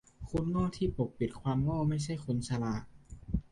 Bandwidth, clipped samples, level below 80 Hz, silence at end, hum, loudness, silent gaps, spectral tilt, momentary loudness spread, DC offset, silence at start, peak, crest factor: 11.5 kHz; under 0.1%; -48 dBFS; 0.1 s; none; -34 LUFS; none; -7.5 dB/octave; 7 LU; under 0.1%; 0.2 s; -18 dBFS; 16 dB